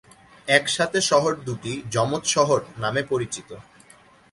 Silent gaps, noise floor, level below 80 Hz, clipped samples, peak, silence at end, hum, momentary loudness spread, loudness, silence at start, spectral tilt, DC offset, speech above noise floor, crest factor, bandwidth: none; -53 dBFS; -58 dBFS; under 0.1%; -2 dBFS; 0.7 s; none; 14 LU; -22 LUFS; 0.45 s; -3 dB/octave; under 0.1%; 30 dB; 22 dB; 11.5 kHz